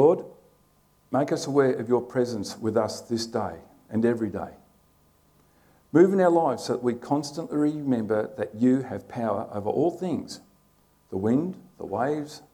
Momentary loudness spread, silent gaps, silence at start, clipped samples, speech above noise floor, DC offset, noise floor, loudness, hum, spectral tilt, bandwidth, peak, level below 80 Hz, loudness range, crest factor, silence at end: 13 LU; none; 0 s; under 0.1%; 38 dB; under 0.1%; -63 dBFS; -26 LUFS; 50 Hz at -60 dBFS; -6.5 dB/octave; 19 kHz; -6 dBFS; -66 dBFS; 5 LU; 20 dB; 0.15 s